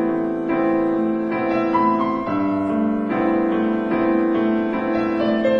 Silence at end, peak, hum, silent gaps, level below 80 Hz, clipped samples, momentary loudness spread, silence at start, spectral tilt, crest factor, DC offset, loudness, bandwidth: 0 s; -6 dBFS; none; none; -52 dBFS; under 0.1%; 3 LU; 0 s; -8.5 dB/octave; 12 dB; under 0.1%; -20 LUFS; 5.8 kHz